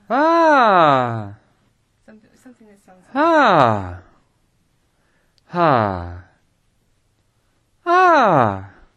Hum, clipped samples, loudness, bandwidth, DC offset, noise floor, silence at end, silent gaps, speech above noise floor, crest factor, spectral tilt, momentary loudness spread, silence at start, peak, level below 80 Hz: none; under 0.1%; -15 LUFS; 10 kHz; under 0.1%; -63 dBFS; 0.3 s; none; 48 dB; 18 dB; -6.5 dB/octave; 17 LU; 0.1 s; 0 dBFS; -54 dBFS